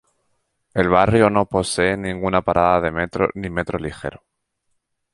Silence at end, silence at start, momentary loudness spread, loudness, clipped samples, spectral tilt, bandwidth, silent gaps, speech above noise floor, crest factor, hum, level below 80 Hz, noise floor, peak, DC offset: 0.95 s; 0.75 s; 12 LU; -19 LUFS; under 0.1%; -5.5 dB/octave; 11.5 kHz; none; 53 dB; 18 dB; none; -42 dBFS; -72 dBFS; -2 dBFS; under 0.1%